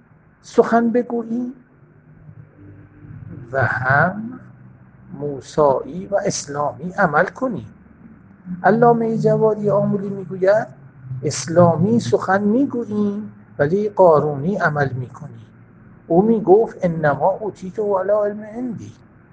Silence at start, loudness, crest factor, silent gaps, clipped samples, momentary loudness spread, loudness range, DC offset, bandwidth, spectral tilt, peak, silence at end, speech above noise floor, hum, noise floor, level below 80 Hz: 0.45 s; -18 LUFS; 18 dB; none; under 0.1%; 16 LU; 6 LU; under 0.1%; 9.4 kHz; -6.5 dB/octave; 0 dBFS; 0.4 s; 31 dB; none; -48 dBFS; -54 dBFS